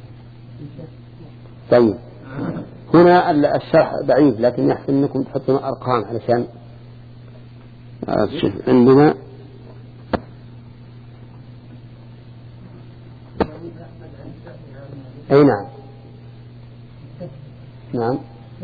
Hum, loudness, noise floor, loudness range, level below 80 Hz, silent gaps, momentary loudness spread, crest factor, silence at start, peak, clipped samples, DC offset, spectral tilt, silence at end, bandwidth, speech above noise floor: none; -17 LUFS; -40 dBFS; 17 LU; -48 dBFS; none; 27 LU; 20 dB; 0 s; 0 dBFS; under 0.1%; under 0.1%; -10 dB/octave; 0 s; 4.9 kHz; 24 dB